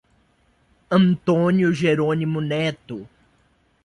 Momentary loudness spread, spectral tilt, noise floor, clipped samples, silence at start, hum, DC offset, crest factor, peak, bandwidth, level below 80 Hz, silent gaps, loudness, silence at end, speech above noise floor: 14 LU; -7.5 dB/octave; -62 dBFS; under 0.1%; 0.9 s; none; under 0.1%; 16 dB; -6 dBFS; 10.5 kHz; -58 dBFS; none; -20 LUFS; 0.8 s; 42 dB